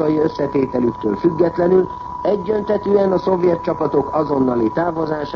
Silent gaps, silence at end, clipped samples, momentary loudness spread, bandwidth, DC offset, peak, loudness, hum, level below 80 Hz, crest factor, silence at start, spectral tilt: none; 0 s; under 0.1%; 4 LU; 6.6 kHz; under 0.1%; -4 dBFS; -18 LUFS; none; -46 dBFS; 14 dB; 0 s; -9 dB/octave